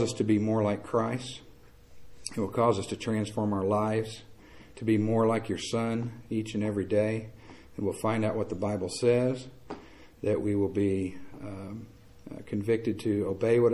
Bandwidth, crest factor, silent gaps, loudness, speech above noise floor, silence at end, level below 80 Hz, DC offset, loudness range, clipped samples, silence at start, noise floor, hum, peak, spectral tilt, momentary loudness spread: 14 kHz; 18 dB; none; -29 LUFS; 24 dB; 0 s; -56 dBFS; 0.2%; 2 LU; under 0.1%; 0 s; -53 dBFS; none; -12 dBFS; -6.5 dB/octave; 16 LU